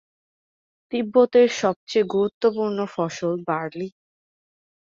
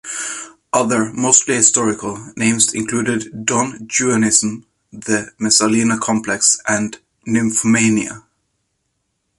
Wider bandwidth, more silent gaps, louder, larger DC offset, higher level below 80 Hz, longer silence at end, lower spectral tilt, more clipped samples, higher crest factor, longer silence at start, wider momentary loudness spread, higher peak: second, 7.6 kHz vs 11.5 kHz; first, 1.76-1.87 s, 2.34-2.41 s vs none; second, -22 LUFS vs -15 LUFS; neither; second, -68 dBFS vs -56 dBFS; second, 1.05 s vs 1.2 s; first, -5.5 dB/octave vs -3 dB/octave; neither; about the same, 18 dB vs 18 dB; first, 0.9 s vs 0.05 s; about the same, 12 LU vs 13 LU; second, -6 dBFS vs 0 dBFS